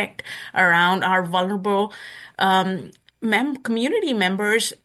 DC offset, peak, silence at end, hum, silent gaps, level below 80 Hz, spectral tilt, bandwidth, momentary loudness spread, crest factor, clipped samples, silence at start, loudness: under 0.1%; -4 dBFS; 0.1 s; none; none; -70 dBFS; -4 dB/octave; 12.5 kHz; 12 LU; 16 dB; under 0.1%; 0 s; -20 LUFS